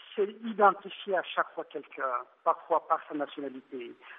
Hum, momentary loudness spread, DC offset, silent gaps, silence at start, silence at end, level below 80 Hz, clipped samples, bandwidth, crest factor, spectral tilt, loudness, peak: none; 16 LU; under 0.1%; none; 0 s; 0 s; under -90 dBFS; under 0.1%; 3.9 kHz; 22 dB; -2 dB/octave; -31 LUFS; -8 dBFS